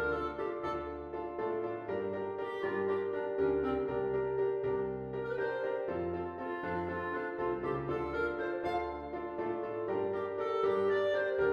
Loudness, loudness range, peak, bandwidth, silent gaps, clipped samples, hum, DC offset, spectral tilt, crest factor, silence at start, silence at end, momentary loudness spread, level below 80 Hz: -35 LUFS; 2 LU; -20 dBFS; 6.6 kHz; none; under 0.1%; none; under 0.1%; -8 dB/octave; 14 dB; 0 s; 0 s; 7 LU; -58 dBFS